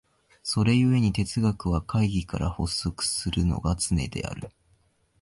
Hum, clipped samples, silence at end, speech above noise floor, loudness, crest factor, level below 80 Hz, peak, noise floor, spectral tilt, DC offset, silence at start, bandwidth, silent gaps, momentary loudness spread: none; under 0.1%; 0.75 s; 40 dB; -26 LUFS; 16 dB; -38 dBFS; -10 dBFS; -65 dBFS; -5.5 dB/octave; under 0.1%; 0.45 s; 11.5 kHz; none; 12 LU